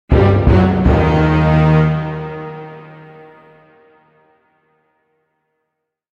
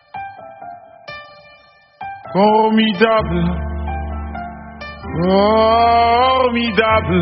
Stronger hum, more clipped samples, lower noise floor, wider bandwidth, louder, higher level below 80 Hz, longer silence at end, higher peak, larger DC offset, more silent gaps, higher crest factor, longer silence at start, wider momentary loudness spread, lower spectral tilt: neither; neither; first, -75 dBFS vs -48 dBFS; first, 6.8 kHz vs 5.8 kHz; about the same, -13 LUFS vs -15 LUFS; first, -24 dBFS vs -32 dBFS; first, 3.25 s vs 0 s; about the same, -2 dBFS vs 0 dBFS; neither; neither; about the same, 14 dB vs 16 dB; about the same, 0.1 s vs 0.15 s; about the same, 19 LU vs 21 LU; first, -9.5 dB/octave vs -4 dB/octave